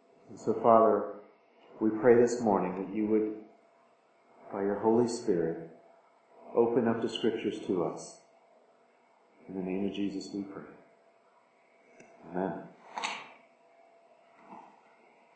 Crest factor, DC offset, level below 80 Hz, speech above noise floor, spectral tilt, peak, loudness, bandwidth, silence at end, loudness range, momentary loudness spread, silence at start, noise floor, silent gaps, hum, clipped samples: 24 dB; under 0.1%; -74 dBFS; 36 dB; -6 dB/octave; -8 dBFS; -30 LUFS; 8.8 kHz; 0.75 s; 14 LU; 21 LU; 0.3 s; -65 dBFS; none; none; under 0.1%